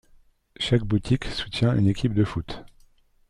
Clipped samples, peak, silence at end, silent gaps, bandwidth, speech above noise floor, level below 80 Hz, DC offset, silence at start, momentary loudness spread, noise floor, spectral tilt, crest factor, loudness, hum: under 0.1%; -6 dBFS; 0.65 s; none; 11 kHz; 34 dB; -42 dBFS; under 0.1%; 0.6 s; 11 LU; -57 dBFS; -7 dB/octave; 18 dB; -24 LUFS; none